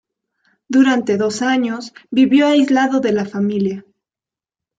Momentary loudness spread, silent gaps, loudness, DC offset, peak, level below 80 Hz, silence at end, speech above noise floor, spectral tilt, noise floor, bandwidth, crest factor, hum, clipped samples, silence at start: 10 LU; none; -16 LUFS; under 0.1%; -4 dBFS; -62 dBFS; 1 s; 75 dB; -5.5 dB/octave; -90 dBFS; 9 kHz; 14 dB; none; under 0.1%; 0.7 s